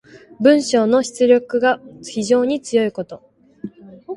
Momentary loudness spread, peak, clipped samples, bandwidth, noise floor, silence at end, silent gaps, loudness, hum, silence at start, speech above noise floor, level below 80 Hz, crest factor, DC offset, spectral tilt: 20 LU; 0 dBFS; under 0.1%; 11.5 kHz; -36 dBFS; 0 s; none; -17 LUFS; none; 0.4 s; 19 dB; -62 dBFS; 18 dB; under 0.1%; -4.5 dB/octave